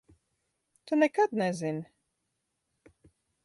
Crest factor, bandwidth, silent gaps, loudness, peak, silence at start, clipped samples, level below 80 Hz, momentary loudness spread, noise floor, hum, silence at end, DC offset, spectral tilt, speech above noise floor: 20 dB; 11.5 kHz; none; -29 LUFS; -14 dBFS; 0.85 s; under 0.1%; -76 dBFS; 13 LU; -81 dBFS; none; 1.6 s; under 0.1%; -6 dB/octave; 54 dB